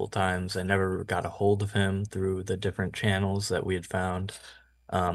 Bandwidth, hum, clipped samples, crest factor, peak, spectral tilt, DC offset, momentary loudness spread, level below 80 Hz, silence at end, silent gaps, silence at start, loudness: 12.5 kHz; none; under 0.1%; 20 dB; -8 dBFS; -5.5 dB/octave; under 0.1%; 5 LU; -56 dBFS; 0 s; none; 0 s; -29 LUFS